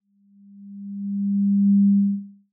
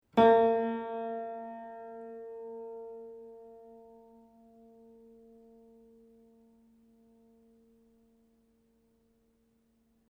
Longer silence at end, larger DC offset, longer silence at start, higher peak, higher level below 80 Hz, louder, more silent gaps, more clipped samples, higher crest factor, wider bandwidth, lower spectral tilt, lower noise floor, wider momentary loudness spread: second, 0.2 s vs 6.25 s; neither; first, 0.55 s vs 0.15 s; about the same, -12 dBFS vs -12 dBFS; second, -88 dBFS vs -72 dBFS; first, -20 LUFS vs -31 LUFS; neither; neither; second, 10 dB vs 24 dB; second, 0.3 kHz vs 5.8 kHz; first, -28 dB/octave vs -7.5 dB/octave; second, -54 dBFS vs -71 dBFS; second, 19 LU vs 29 LU